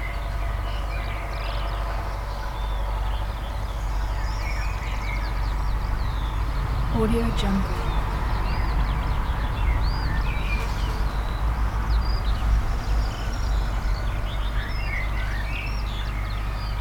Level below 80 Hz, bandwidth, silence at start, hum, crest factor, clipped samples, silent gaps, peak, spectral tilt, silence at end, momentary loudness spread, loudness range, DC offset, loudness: -26 dBFS; 15.5 kHz; 0 s; none; 14 dB; under 0.1%; none; -10 dBFS; -6 dB/octave; 0 s; 5 LU; 4 LU; under 0.1%; -28 LUFS